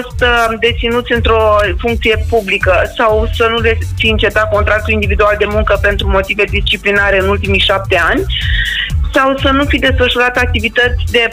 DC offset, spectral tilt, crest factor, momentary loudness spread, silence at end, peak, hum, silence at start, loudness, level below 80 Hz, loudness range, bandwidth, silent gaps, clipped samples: under 0.1%; -5.5 dB/octave; 10 dB; 3 LU; 0 s; -2 dBFS; none; 0 s; -11 LUFS; -20 dBFS; 0 LU; 16 kHz; none; under 0.1%